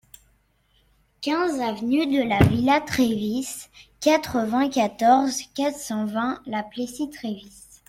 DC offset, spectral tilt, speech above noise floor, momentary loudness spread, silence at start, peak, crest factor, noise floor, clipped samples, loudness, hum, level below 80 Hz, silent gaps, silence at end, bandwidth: under 0.1%; -5.5 dB/octave; 41 dB; 13 LU; 1.2 s; -4 dBFS; 20 dB; -64 dBFS; under 0.1%; -23 LUFS; none; -48 dBFS; none; 0.4 s; 16.5 kHz